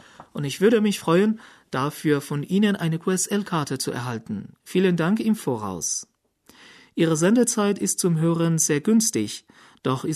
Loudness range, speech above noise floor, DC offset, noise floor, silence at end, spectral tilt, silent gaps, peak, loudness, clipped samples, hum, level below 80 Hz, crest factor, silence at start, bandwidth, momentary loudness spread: 4 LU; 33 dB; under 0.1%; -55 dBFS; 0 s; -5 dB/octave; none; -6 dBFS; -23 LUFS; under 0.1%; none; -66 dBFS; 16 dB; 0.2 s; 13.5 kHz; 12 LU